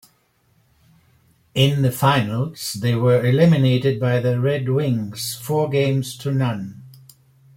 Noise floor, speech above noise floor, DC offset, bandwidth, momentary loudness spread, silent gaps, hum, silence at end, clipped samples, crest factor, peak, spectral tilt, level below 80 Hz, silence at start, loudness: -62 dBFS; 43 dB; under 0.1%; 16.5 kHz; 10 LU; none; none; 0.65 s; under 0.1%; 16 dB; -4 dBFS; -6 dB/octave; -56 dBFS; 1.55 s; -19 LUFS